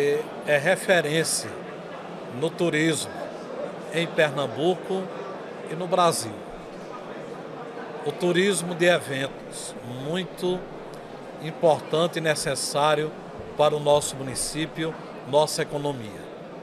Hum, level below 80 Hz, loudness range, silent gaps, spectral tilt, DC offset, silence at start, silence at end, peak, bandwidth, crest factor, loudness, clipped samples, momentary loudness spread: none; -58 dBFS; 4 LU; none; -4 dB/octave; under 0.1%; 0 s; 0 s; -8 dBFS; 15 kHz; 18 dB; -25 LUFS; under 0.1%; 16 LU